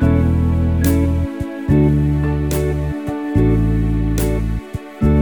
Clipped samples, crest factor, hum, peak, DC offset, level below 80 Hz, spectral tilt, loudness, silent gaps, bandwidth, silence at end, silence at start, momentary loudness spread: under 0.1%; 12 dB; none; -4 dBFS; 0.2%; -22 dBFS; -8 dB/octave; -18 LUFS; none; over 20 kHz; 0 s; 0 s; 8 LU